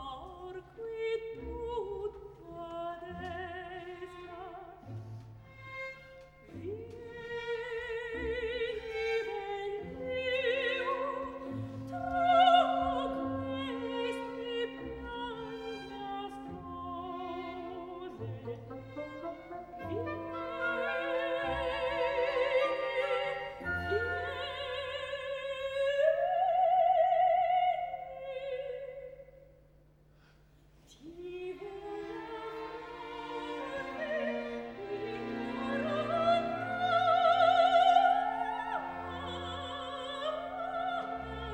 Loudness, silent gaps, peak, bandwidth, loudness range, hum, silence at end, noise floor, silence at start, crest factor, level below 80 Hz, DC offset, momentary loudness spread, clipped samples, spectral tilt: -33 LUFS; none; -12 dBFS; 9.2 kHz; 15 LU; none; 0 s; -62 dBFS; 0 s; 22 dB; -58 dBFS; under 0.1%; 18 LU; under 0.1%; -5.5 dB/octave